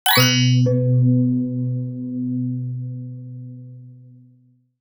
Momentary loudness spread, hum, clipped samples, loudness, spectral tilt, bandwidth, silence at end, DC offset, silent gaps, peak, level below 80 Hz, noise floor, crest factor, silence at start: 21 LU; none; under 0.1%; -19 LUFS; -5 dB/octave; over 20 kHz; 0.85 s; under 0.1%; none; -2 dBFS; -56 dBFS; -56 dBFS; 18 dB; 0.05 s